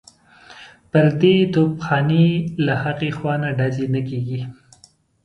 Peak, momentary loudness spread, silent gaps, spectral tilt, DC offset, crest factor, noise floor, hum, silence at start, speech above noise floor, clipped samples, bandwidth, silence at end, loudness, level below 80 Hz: -2 dBFS; 10 LU; none; -8 dB/octave; under 0.1%; 18 dB; -54 dBFS; none; 0.5 s; 36 dB; under 0.1%; 8.4 kHz; 0.7 s; -19 LUFS; -54 dBFS